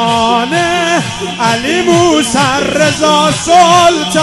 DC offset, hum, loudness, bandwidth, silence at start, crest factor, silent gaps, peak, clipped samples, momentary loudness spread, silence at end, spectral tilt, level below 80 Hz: under 0.1%; none; -10 LUFS; 12.5 kHz; 0 s; 10 dB; none; 0 dBFS; under 0.1%; 6 LU; 0 s; -3.5 dB/octave; -40 dBFS